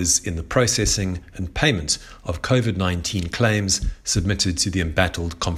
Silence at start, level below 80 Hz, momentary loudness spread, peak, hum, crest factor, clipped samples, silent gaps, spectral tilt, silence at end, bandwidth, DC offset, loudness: 0 s; -34 dBFS; 7 LU; -4 dBFS; none; 18 dB; under 0.1%; none; -3.5 dB/octave; 0 s; 15 kHz; under 0.1%; -21 LUFS